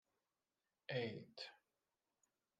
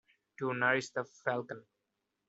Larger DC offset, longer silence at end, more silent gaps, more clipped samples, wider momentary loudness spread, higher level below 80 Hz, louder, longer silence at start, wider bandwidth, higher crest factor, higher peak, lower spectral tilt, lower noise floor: neither; first, 1.05 s vs 0.65 s; neither; neither; second, 11 LU vs 14 LU; second, under -90 dBFS vs -80 dBFS; second, -49 LUFS vs -34 LUFS; first, 0.9 s vs 0.4 s; first, 9.4 kHz vs 8 kHz; about the same, 24 dB vs 24 dB; second, -30 dBFS vs -14 dBFS; first, -6 dB/octave vs -3.5 dB/octave; first, under -90 dBFS vs -85 dBFS